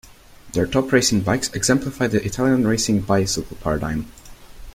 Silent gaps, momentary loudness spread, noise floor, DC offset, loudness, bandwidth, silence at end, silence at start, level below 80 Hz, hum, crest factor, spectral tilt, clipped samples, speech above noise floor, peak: none; 8 LU; -44 dBFS; under 0.1%; -20 LUFS; 16.5 kHz; 0.05 s; 0.3 s; -40 dBFS; none; 18 dB; -4.5 dB/octave; under 0.1%; 24 dB; -2 dBFS